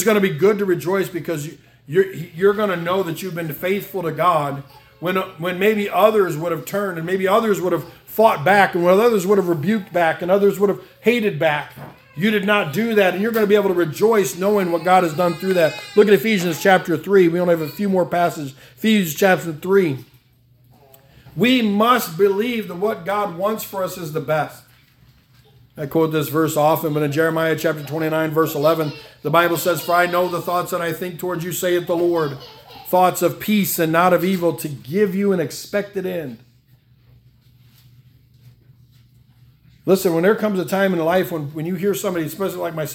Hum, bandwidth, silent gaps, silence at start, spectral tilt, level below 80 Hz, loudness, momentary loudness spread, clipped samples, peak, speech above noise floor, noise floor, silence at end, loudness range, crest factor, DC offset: none; 18 kHz; none; 0 s; -5.5 dB/octave; -60 dBFS; -19 LUFS; 10 LU; under 0.1%; 0 dBFS; 36 dB; -55 dBFS; 0 s; 6 LU; 20 dB; under 0.1%